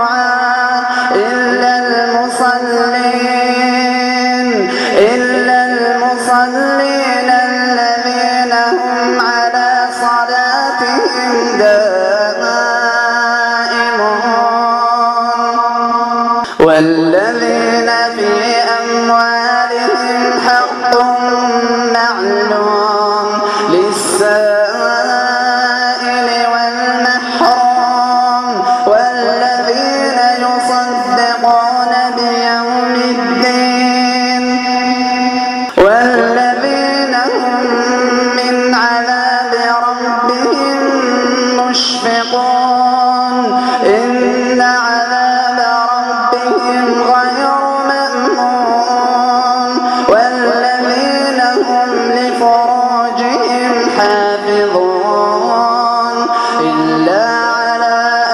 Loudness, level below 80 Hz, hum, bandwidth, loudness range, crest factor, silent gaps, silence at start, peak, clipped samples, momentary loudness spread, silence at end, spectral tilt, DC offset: -11 LUFS; -54 dBFS; none; 12.5 kHz; 1 LU; 12 dB; none; 0 s; 0 dBFS; under 0.1%; 3 LU; 0 s; -3 dB/octave; under 0.1%